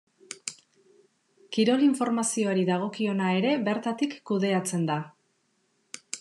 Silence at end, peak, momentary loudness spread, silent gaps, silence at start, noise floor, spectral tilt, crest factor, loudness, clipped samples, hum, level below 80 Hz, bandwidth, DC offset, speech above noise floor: 0 s; -12 dBFS; 15 LU; none; 0.3 s; -71 dBFS; -5 dB/octave; 16 dB; -27 LUFS; under 0.1%; none; -86 dBFS; 12.5 kHz; under 0.1%; 46 dB